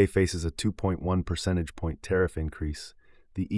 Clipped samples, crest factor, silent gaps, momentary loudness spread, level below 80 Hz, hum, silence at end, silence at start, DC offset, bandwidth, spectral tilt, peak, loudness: under 0.1%; 20 dB; none; 9 LU; -42 dBFS; none; 0 s; 0 s; under 0.1%; 12 kHz; -6 dB/octave; -10 dBFS; -29 LUFS